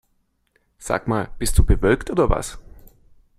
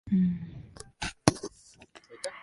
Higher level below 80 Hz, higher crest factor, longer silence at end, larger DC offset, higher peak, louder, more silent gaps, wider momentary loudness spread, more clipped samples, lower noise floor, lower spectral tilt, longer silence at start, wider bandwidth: first, -26 dBFS vs -52 dBFS; second, 20 dB vs 30 dB; first, 0.6 s vs 0 s; neither; about the same, -2 dBFS vs -2 dBFS; first, -21 LUFS vs -31 LUFS; neither; second, 9 LU vs 20 LU; neither; first, -67 dBFS vs -55 dBFS; about the same, -5.5 dB/octave vs -5 dB/octave; first, 0.8 s vs 0.05 s; first, 15 kHz vs 11.5 kHz